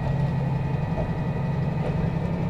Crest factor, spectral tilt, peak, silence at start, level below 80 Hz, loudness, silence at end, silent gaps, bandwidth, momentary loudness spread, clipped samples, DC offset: 10 dB; -9.5 dB/octave; -14 dBFS; 0 s; -38 dBFS; -26 LUFS; 0 s; none; 7.4 kHz; 2 LU; under 0.1%; under 0.1%